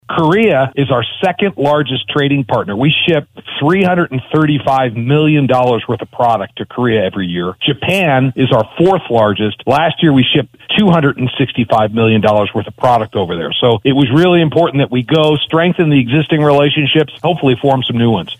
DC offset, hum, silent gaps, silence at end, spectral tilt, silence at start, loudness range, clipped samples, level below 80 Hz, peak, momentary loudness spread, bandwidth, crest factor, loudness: under 0.1%; none; none; 0.05 s; -7.5 dB/octave; 0.1 s; 2 LU; under 0.1%; -46 dBFS; 0 dBFS; 6 LU; 12.5 kHz; 12 dB; -12 LUFS